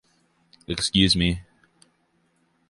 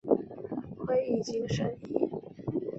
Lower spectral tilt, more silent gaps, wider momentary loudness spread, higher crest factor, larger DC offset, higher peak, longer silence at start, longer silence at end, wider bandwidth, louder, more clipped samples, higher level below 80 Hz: second, -4 dB/octave vs -7 dB/octave; neither; first, 14 LU vs 10 LU; about the same, 22 dB vs 22 dB; neither; first, -4 dBFS vs -10 dBFS; first, 0.7 s vs 0.05 s; first, 1.3 s vs 0 s; first, 11.5 kHz vs 8 kHz; first, -22 LUFS vs -33 LUFS; neither; first, -42 dBFS vs -60 dBFS